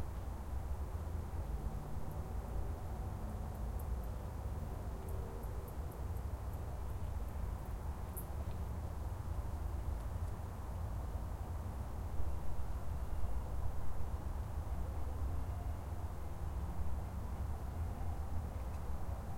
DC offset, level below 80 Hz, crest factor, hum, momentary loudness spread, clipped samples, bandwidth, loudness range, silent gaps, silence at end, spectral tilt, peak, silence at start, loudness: under 0.1%; -44 dBFS; 14 dB; none; 2 LU; under 0.1%; 16.5 kHz; 1 LU; none; 0 s; -7 dB/octave; -24 dBFS; 0 s; -44 LUFS